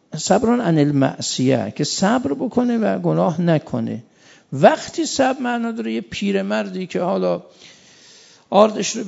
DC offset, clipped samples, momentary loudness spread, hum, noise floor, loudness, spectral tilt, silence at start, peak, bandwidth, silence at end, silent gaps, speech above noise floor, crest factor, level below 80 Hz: under 0.1%; under 0.1%; 10 LU; none; -48 dBFS; -19 LUFS; -5.5 dB/octave; 0.1 s; 0 dBFS; 8 kHz; 0 s; none; 29 dB; 20 dB; -58 dBFS